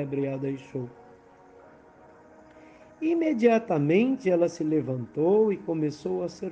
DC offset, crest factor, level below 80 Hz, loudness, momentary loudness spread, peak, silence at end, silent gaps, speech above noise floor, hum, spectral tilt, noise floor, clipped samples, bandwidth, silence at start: under 0.1%; 20 dB; -68 dBFS; -26 LUFS; 10 LU; -8 dBFS; 0 s; none; 28 dB; none; -8 dB/octave; -53 dBFS; under 0.1%; 8.4 kHz; 0 s